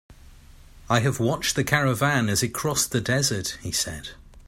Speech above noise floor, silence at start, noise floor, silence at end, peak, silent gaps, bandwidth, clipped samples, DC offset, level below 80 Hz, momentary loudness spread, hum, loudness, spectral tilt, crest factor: 24 dB; 0.1 s; -48 dBFS; 0.05 s; -4 dBFS; none; 16.5 kHz; under 0.1%; under 0.1%; -48 dBFS; 7 LU; none; -23 LUFS; -3.5 dB/octave; 22 dB